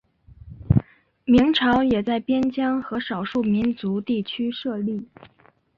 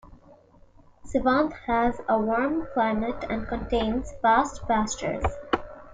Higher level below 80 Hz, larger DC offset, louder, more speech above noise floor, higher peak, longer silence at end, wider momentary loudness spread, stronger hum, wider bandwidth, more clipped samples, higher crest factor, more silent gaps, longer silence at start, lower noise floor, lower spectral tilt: about the same, -44 dBFS vs -42 dBFS; neither; first, -22 LUFS vs -26 LUFS; second, 24 dB vs 29 dB; first, -4 dBFS vs -8 dBFS; first, 0.75 s vs 0 s; about the same, 9 LU vs 8 LU; neither; second, 6.8 kHz vs 9.4 kHz; neither; about the same, 20 dB vs 18 dB; neither; first, 0.45 s vs 0.05 s; second, -46 dBFS vs -54 dBFS; first, -8 dB/octave vs -5 dB/octave